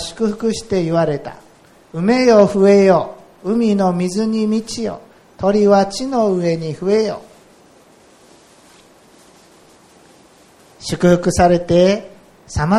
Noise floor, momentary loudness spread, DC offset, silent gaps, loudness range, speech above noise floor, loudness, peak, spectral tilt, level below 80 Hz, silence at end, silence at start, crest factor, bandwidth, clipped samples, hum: -48 dBFS; 15 LU; under 0.1%; none; 9 LU; 33 dB; -16 LUFS; 0 dBFS; -6 dB/octave; -42 dBFS; 0 s; 0 s; 16 dB; 13.5 kHz; under 0.1%; none